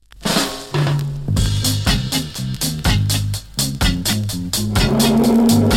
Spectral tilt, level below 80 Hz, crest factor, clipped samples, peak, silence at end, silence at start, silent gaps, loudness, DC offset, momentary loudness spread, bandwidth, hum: -4.5 dB/octave; -28 dBFS; 14 dB; under 0.1%; -2 dBFS; 0 s; 0.15 s; none; -18 LUFS; under 0.1%; 8 LU; 17 kHz; none